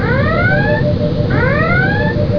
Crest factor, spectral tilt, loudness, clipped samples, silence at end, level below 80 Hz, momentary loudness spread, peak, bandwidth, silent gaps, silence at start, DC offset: 12 dB; -9 dB/octave; -13 LUFS; under 0.1%; 0 s; -28 dBFS; 3 LU; 0 dBFS; 5.4 kHz; none; 0 s; under 0.1%